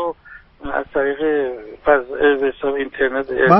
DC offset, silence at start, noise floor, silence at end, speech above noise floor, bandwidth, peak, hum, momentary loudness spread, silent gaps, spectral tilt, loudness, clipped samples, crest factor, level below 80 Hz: under 0.1%; 0 s; -43 dBFS; 0 s; 26 dB; 5.8 kHz; 0 dBFS; none; 10 LU; none; -4 dB/octave; -19 LUFS; under 0.1%; 18 dB; -46 dBFS